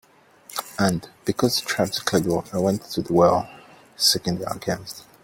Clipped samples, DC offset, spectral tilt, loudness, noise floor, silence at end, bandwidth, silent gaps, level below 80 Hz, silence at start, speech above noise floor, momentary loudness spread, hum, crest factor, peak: under 0.1%; under 0.1%; -4 dB/octave; -23 LUFS; -50 dBFS; 0.2 s; 17 kHz; none; -54 dBFS; 0.5 s; 28 dB; 12 LU; none; 20 dB; -4 dBFS